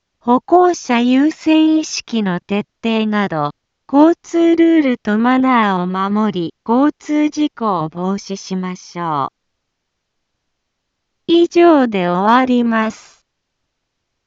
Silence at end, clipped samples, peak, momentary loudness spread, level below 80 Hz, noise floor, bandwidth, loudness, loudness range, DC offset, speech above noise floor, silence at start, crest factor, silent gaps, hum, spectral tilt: 1.3 s; under 0.1%; 0 dBFS; 11 LU; -60 dBFS; -73 dBFS; 7.6 kHz; -15 LUFS; 8 LU; under 0.1%; 59 dB; 0.25 s; 16 dB; none; none; -5.5 dB/octave